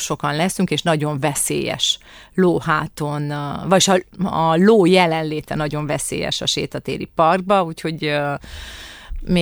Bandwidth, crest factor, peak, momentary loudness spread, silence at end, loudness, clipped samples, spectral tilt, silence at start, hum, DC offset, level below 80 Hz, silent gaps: over 20 kHz; 18 dB; -2 dBFS; 11 LU; 0 s; -19 LUFS; under 0.1%; -4.5 dB/octave; 0 s; none; under 0.1%; -42 dBFS; none